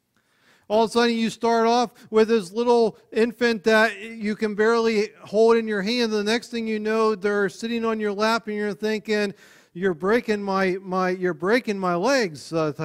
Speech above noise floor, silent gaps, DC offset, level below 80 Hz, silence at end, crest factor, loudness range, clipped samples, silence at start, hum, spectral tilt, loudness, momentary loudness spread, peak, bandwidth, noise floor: 41 dB; none; under 0.1%; -64 dBFS; 0 s; 16 dB; 3 LU; under 0.1%; 0.7 s; none; -5 dB/octave; -22 LUFS; 7 LU; -6 dBFS; 14 kHz; -63 dBFS